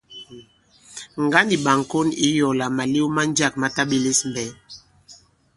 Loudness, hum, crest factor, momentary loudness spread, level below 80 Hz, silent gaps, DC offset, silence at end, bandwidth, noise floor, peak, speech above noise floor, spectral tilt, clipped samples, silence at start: -20 LUFS; none; 22 dB; 20 LU; -58 dBFS; none; under 0.1%; 0.4 s; 11.5 kHz; -53 dBFS; 0 dBFS; 32 dB; -3.5 dB/octave; under 0.1%; 0.1 s